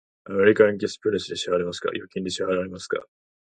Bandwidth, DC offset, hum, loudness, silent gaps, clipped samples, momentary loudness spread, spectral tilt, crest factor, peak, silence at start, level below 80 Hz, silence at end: 9.4 kHz; under 0.1%; none; -24 LUFS; none; under 0.1%; 12 LU; -4.5 dB/octave; 22 dB; -4 dBFS; 0.25 s; -58 dBFS; 0.35 s